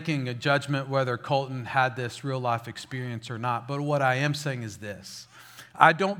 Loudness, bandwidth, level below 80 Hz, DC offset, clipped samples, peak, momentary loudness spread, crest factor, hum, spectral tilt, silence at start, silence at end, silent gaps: -27 LUFS; 16.5 kHz; -70 dBFS; under 0.1%; under 0.1%; 0 dBFS; 16 LU; 28 dB; none; -5.5 dB/octave; 0 s; 0 s; none